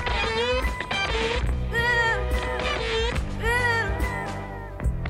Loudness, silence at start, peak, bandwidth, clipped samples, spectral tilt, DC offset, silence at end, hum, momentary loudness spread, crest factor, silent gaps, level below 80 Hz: -25 LUFS; 0 s; -10 dBFS; 15.5 kHz; under 0.1%; -4.5 dB/octave; under 0.1%; 0 s; none; 9 LU; 14 dB; none; -30 dBFS